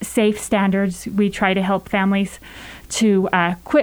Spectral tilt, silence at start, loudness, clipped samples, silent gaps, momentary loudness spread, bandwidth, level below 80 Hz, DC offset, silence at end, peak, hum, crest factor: -5 dB/octave; 0 s; -19 LUFS; under 0.1%; none; 10 LU; over 20 kHz; -46 dBFS; under 0.1%; 0 s; -2 dBFS; none; 16 dB